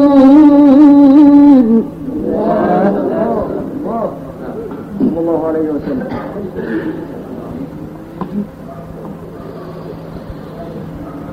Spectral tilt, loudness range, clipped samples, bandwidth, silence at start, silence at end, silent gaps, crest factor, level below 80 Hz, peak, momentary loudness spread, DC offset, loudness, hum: -9.5 dB/octave; 18 LU; under 0.1%; 4.9 kHz; 0 s; 0 s; none; 12 dB; -40 dBFS; 0 dBFS; 23 LU; under 0.1%; -11 LUFS; none